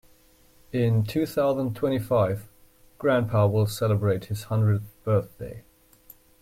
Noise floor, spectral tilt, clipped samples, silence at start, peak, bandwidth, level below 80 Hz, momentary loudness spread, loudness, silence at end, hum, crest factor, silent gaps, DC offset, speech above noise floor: -57 dBFS; -7.5 dB/octave; under 0.1%; 0.75 s; -10 dBFS; 16 kHz; -54 dBFS; 10 LU; -25 LUFS; 0.8 s; none; 16 dB; none; under 0.1%; 33 dB